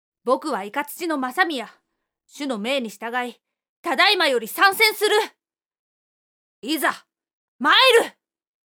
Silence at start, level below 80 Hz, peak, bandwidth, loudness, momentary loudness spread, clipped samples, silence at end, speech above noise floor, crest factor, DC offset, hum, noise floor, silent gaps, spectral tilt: 0.25 s; -86 dBFS; -4 dBFS; over 20 kHz; -20 LUFS; 16 LU; under 0.1%; 0.6 s; 49 dB; 20 dB; under 0.1%; none; -70 dBFS; 3.69-3.84 s, 5.79-6.62 s, 7.33-7.59 s; -1.5 dB/octave